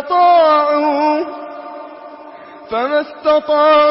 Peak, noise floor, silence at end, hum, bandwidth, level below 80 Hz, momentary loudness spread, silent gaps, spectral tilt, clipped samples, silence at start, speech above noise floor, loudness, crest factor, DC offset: -2 dBFS; -35 dBFS; 0 s; none; 5.8 kHz; -60 dBFS; 22 LU; none; -7.5 dB/octave; under 0.1%; 0 s; 23 dB; -13 LUFS; 12 dB; under 0.1%